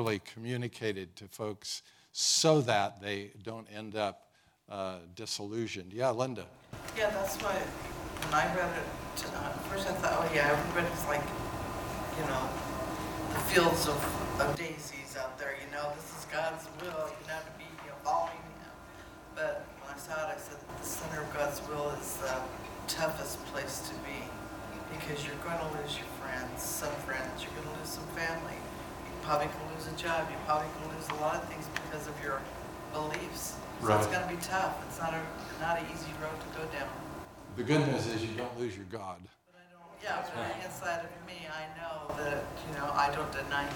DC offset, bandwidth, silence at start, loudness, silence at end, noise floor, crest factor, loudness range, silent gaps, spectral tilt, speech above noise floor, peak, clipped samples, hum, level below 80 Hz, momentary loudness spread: under 0.1%; 18 kHz; 0 s; -35 LUFS; 0 s; -58 dBFS; 26 dB; 7 LU; none; -4 dB/octave; 24 dB; -10 dBFS; under 0.1%; none; -54 dBFS; 13 LU